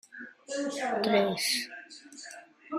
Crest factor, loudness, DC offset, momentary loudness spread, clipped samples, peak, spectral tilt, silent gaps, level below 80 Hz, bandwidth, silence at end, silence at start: 18 dB; -29 LUFS; under 0.1%; 20 LU; under 0.1%; -14 dBFS; -3 dB/octave; none; -76 dBFS; 15 kHz; 0 s; 0.1 s